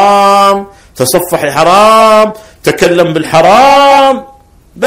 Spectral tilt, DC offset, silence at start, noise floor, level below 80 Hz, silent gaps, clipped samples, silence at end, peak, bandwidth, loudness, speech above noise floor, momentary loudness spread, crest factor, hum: -4 dB/octave; 0.7%; 0 s; -37 dBFS; -40 dBFS; none; 6%; 0 s; 0 dBFS; 17 kHz; -6 LUFS; 31 dB; 10 LU; 6 dB; none